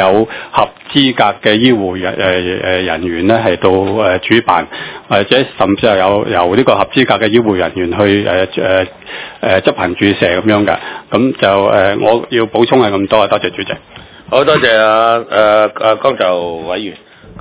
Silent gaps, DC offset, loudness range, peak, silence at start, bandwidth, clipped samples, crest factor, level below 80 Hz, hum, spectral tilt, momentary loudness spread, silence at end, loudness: none; under 0.1%; 1 LU; 0 dBFS; 0 s; 4 kHz; 1%; 12 dB; -40 dBFS; none; -9.5 dB/octave; 8 LU; 0 s; -11 LUFS